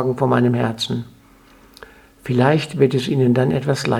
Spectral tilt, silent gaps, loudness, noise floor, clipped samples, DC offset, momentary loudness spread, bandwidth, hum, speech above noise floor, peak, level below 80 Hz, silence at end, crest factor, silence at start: -6.5 dB/octave; none; -18 LUFS; -49 dBFS; under 0.1%; under 0.1%; 9 LU; 13.5 kHz; none; 31 dB; 0 dBFS; -52 dBFS; 0 s; 18 dB; 0 s